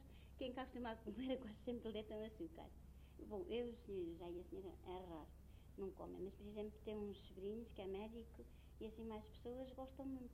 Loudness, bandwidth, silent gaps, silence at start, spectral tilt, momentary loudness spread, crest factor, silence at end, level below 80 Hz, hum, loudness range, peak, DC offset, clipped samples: -52 LUFS; 16 kHz; none; 0 s; -7 dB/octave; 12 LU; 18 dB; 0 s; -64 dBFS; none; 3 LU; -34 dBFS; under 0.1%; under 0.1%